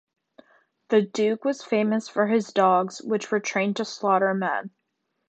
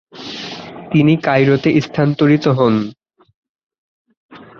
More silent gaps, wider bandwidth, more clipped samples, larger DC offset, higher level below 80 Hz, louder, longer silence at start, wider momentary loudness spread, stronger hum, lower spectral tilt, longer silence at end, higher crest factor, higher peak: second, none vs 3.34-3.42 s, 3.49-3.55 s, 3.63-3.70 s, 3.78-4.05 s, 4.17-4.29 s; first, 8.6 kHz vs 7 kHz; neither; neither; second, -76 dBFS vs -54 dBFS; second, -24 LUFS vs -14 LUFS; first, 0.9 s vs 0.15 s; second, 7 LU vs 16 LU; neither; second, -5 dB/octave vs -8 dB/octave; first, 0.6 s vs 0.15 s; about the same, 18 dB vs 14 dB; second, -6 dBFS vs -2 dBFS